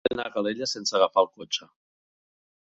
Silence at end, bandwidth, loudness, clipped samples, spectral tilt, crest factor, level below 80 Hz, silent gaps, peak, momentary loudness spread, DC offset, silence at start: 1.05 s; 8 kHz; -26 LUFS; under 0.1%; -2.5 dB/octave; 22 dB; -66 dBFS; none; -6 dBFS; 10 LU; under 0.1%; 0.05 s